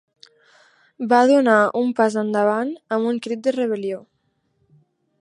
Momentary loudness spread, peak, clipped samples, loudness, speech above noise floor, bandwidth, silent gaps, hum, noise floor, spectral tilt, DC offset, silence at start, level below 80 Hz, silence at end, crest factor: 12 LU; -2 dBFS; under 0.1%; -19 LUFS; 49 dB; 11 kHz; none; none; -68 dBFS; -5.5 dB/octave; under 0.1%; 1 s; -76 dBFS; 1.2 s; 18 dB